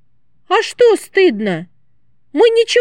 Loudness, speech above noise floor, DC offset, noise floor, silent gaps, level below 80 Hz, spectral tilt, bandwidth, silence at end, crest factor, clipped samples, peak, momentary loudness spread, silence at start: -14 LUFS; 51 dB; 0.4%; -64 dBFS; none; -68 dBFS; -4 dB/octave; 12.5 kHz; 0 s; 14 dB; under 0.1%; -2 dBFS; 10 LU; 0.5 s